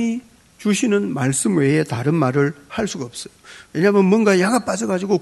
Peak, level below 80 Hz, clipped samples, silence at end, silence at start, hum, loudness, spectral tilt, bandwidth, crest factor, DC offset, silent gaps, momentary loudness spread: -2 dBFS; -56 dBFS; under 0.1%; 0 s; 0 s; none; -18 LUFS; -5.5 dB/octave; 12 kHz; 16 dB; under 0.1%; none; 14 LU